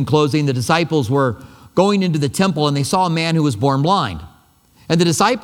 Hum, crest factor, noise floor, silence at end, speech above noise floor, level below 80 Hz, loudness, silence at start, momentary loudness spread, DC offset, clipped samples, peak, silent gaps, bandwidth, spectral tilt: none; 16 dB; -52 dBFS; 0 s; 36 dB; -48 dBFS; -17 LUFS; 0 s; 5 LU; under 0.1%; under 0.1%; 0 dBFS; none; 16.5 kHz; -5.5 dB/octave